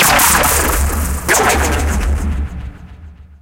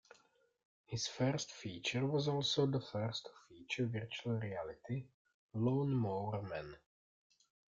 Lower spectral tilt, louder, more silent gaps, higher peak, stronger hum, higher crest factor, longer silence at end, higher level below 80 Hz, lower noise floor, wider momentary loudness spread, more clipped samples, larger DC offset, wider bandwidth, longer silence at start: second, -3 dB/octave vs -5.5 dB/octave; first, -13 LUFS vs -39 LUFS; second, none vs 5.14-5.25 s, 5.34-5.49 s; first, 0 dBFS vs -22 dBFS; neither; about the same, 14 dB vs 18 dB; second, 0.05 s vs 1 s; first, -20 dBFS vs -72 dBFS; second, -36 dBFS vs -73 dBFS; first, 15 LU vs 11 LU; neither; neither; first, 17.5 kHz vs 7.8 kHz; second, 0 s vs 0.9 s